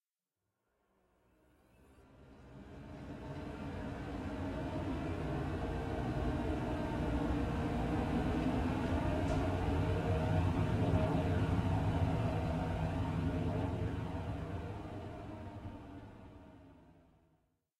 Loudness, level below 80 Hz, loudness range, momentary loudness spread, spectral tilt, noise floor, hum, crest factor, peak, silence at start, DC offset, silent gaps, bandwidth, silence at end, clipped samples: -37 LUFS; -46 dBFS; 14 LU; 15 LU; -8 dB/octave; under -90 dBFS; none; 18 dB; -18 dBFS; 2 s; under 0.1%; none; 12 kHz; 1 s; under 0.1%